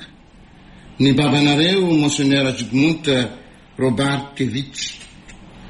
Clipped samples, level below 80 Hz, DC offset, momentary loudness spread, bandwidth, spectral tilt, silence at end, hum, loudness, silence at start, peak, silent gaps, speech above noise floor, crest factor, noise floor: under 0.1%; -48 dBFS; under 0.1%; 12 LU; 11.5 kHz; -5 dB/octave; 0 s; none; -18 LUFS; 0 s; -2 dBFS; none; 28 dB; 16 dB; -45 dBFS